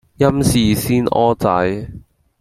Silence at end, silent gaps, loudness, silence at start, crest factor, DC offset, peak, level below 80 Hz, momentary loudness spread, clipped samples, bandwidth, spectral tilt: 0.4 s; none; -16 LUFS; 0.2 s; 14 dB; under 0.1%; -2 dBFS; -38 dBFS; 8 LU; under 0.1%; 16.5 kHz; -6 dB/octave